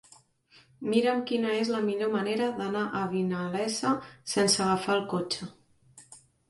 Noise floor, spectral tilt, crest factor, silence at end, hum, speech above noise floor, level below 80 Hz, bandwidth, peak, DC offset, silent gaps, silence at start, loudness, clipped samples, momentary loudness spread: -61 dBFS; -4 dB/octave; 18 dB; 0.3 s; none; 33 dB; -68 dBFS; 11.5 kHz; -12 dBFS; under 0.1%; none; 0.8 s; -28 LUFS; under 0.1%; 7 LU